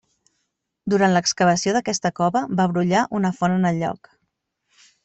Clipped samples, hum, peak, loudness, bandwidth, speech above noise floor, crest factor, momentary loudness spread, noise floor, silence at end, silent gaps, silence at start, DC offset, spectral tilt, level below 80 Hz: under 0.1%; none; -6 dBFS; -20 LUFS; 8.2 kHz; 56 dB; 16 dB; 7 LU; -75 dBFS; 1.1 s; none; 0.85 s; under 0.1%; -5 dB/octave; -60 dBFS